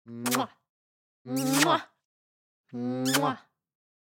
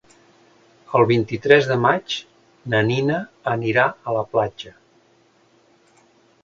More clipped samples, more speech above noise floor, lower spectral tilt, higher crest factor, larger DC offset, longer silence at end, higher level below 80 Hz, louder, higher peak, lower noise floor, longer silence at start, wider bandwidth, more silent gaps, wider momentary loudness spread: neither; first, over 63 dB vs 38 dB; second, -3.5 dB/octave vs -6.5 dB/octave; about the same, 22 dB vs 22 dB; neither; second, 0.65 s vs 1.75 s; second, -84 dBFS vs -58 dBFS; second, -28 LUFS vs -20 LUFS; second, -8 dBFS vs 0 dBFS; first, under -90 dBFS vs -58 dBFS; second, 0.05 s vs 0.9 s; first, 17 kHz vs 7.6 kHz; first, 0.69-1.25 s, 2.05-2.64 s vs none; about the same, 14 LU vs 13 LU